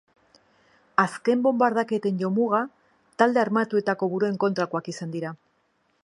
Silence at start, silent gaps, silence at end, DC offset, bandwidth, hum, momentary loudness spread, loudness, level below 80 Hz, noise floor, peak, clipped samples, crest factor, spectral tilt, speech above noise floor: 1 s; none; 0.7 s; under 0.1%; 11.5 kHz; none; 11 LU; -24 LUFS; -76 dBFS; -69 dBFS; -4 dBFS; under 0.1%; 22 dB; -6.5 dB/octave; 45 dB